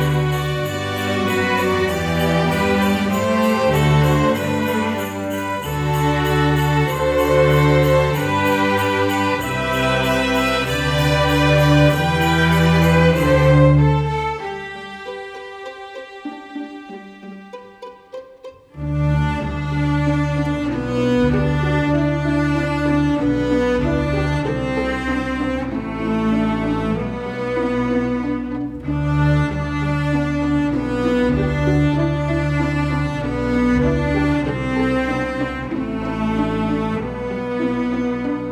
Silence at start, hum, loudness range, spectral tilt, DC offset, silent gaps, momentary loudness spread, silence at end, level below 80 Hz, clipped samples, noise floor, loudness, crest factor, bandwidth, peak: 0 s; none; 7 LU; -6.5 dB/octave; under 0.1%; none; 15 LU; 0 s; -32 dBFS; under 0.1%; -40 dBFS; -18 LUFS; 16 dB; over 20 kHz; -2 dBFS